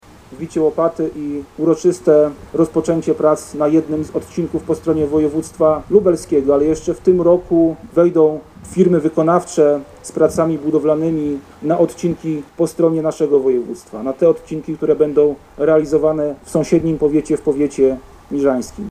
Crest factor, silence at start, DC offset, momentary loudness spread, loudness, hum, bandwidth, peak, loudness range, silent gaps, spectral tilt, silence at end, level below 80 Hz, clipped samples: 16 dB; 0.3 s; under 0.1%; 9 LU; -16 LUFS; none; 13 kHz; 0 dBFS; 3 LU; none; -7.5 dB/octave; 0 s; -46 dBFS; under 0.1%